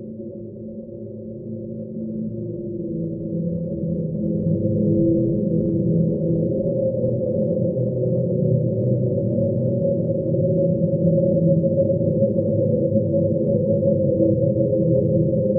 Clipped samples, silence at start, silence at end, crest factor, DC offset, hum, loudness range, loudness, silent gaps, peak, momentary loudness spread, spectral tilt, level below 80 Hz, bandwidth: under 0.1%; 0 s; 0 s; 14 dB; under 0.1%; none; 8 LU; -21 LUFS; none; -6 dBFS; 13 LU; -17 dB/octave; -48 dBFS; 1.1 kHz